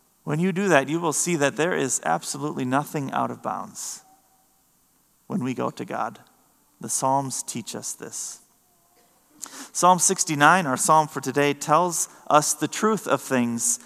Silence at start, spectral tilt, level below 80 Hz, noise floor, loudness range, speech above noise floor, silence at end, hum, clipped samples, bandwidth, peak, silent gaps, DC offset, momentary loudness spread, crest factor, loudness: 0.25 s; -3.5 dB/octave; -76 dBFS; -63 dBFS; 11 LU; 40 dB; 0.1 s; none; under 0.1%; 15 kHz; 0 dBFS; none; under 0.1%; 14 LU; 24 dB; -23 LUFS